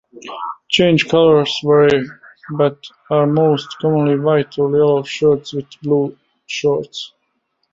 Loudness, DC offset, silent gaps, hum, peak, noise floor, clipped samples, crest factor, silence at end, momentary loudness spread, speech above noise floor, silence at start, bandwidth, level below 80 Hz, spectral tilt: -15 LUFS; under 0.1%; none; none; -2 dBFS; -68 dBFS; under 0.1%; 16 dB; 0.65 s; 16 LU; 53 dB; 0.15 s; 7.8 kHz; -56 dBFS; -6 dB/octave